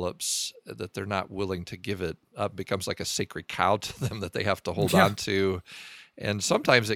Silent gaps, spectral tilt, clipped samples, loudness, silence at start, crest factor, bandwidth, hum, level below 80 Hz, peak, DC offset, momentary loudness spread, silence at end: none; -4 dB/octave; under 0.1%; -28 LUFS; 0 s; 26 dB; 19 kHz; none; -58 dBFS; -2 dBFS; under 0.1%; 14 LU; 0 s